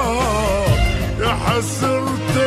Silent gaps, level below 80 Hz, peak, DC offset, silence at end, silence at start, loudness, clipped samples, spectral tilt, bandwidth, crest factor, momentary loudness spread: none; -26 dBFS; -4 dBFS; under 0.1%; 0 s; 0 s; -18 LUFS; under 0.1%; -5 dB/octave; 13.5 kHz; 12 dB; 3 LU